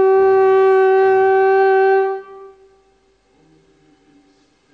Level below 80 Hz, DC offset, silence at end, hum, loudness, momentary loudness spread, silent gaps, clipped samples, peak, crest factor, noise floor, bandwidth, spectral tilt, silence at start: -62 dBFS; under 0.1%; 2.25 s; none; -13 LUFS; 5 LU; none; under 0.1%; -4 dBFS; 10 dB; -57 dBFS; 4.5 kHz; -6.5 dB/octave; 0 s